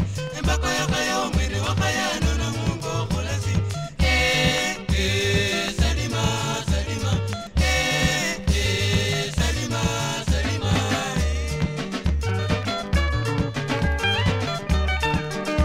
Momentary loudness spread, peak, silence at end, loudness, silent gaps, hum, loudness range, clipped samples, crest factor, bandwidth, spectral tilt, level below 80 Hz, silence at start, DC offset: 5 LU; -6 dBFS; 0 s; -23 LUFS; none; none; 2 LU; under 0.1%; 16 dB; 16 kHz; -4.5 dB/octave; -28 dBFS; 0 s; under 0.1%